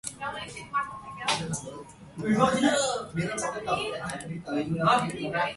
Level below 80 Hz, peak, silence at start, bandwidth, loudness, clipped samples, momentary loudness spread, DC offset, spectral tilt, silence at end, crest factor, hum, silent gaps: -58 dBFS; -8 dBFS; 0.05 s; 11.5 kHz; -28 LUFS; under 0.1%; 13 LU; under 0.1%; -4 dB/octave; 0 s; 20 dB; none; none